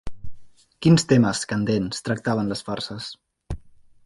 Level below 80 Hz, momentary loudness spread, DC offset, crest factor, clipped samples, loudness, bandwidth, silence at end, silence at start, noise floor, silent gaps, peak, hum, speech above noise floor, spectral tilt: -46 dBFS; 20 LU; under 0.1%; 18 dB; under 0.1%; -22 LUFS; 11.5 kHz; 0.45 s; 0.05 s; -47 dBFS; none; -4 dBFS; none; 26 dB; -5.5 dB/octave